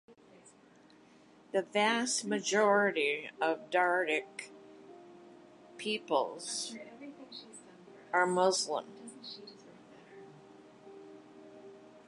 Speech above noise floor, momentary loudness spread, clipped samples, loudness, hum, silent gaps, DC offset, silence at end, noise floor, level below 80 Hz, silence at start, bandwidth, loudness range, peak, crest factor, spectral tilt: 29 dB; 26 LU; under 0.1%; -31 LUFS; none; none; under 0.1%; 0.1 s; -61 dBFS; -86 dBFS; 0.1 s; 11 kHz; 9 LU; -14 dBFS; 22 dB; -2.5 dB/octave